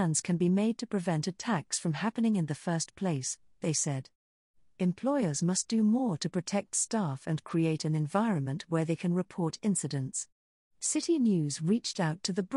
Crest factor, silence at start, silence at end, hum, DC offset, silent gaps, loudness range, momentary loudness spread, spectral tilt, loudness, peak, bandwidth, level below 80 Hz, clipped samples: 16 dB; 0 s; 0 s; none; under 0.1%; 4.15-4.54 s, 10.32-10.71 s; 2 LU; 6 LU; -5 dB/octave; -31 LUFS; -14 dBFS; 11.5 kHz; -72 dBFS; under 0.1%